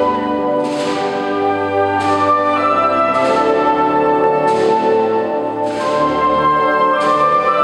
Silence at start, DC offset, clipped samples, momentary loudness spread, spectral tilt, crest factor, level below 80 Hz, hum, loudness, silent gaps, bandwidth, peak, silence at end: 0 s; under 0.1%; under 0.1%; 5 LU; -5.5 dB/octave; 12 dB; -50 dBFS; none; -15 LUFS; none; 11.5 kHz; -4 dBFS; 0 s